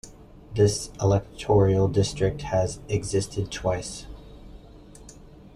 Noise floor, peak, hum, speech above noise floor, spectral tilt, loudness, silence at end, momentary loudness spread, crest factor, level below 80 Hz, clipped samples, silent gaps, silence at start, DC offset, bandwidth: -47 dBFS; -8 dBFS; none; 23 dB; -6 dB/octave; -25 LUFS; 0.1 s; 13 LU; 18 dB; -44 dBFS; under 0.1%; none; 0.05 s; under 0.1%; 12 kHz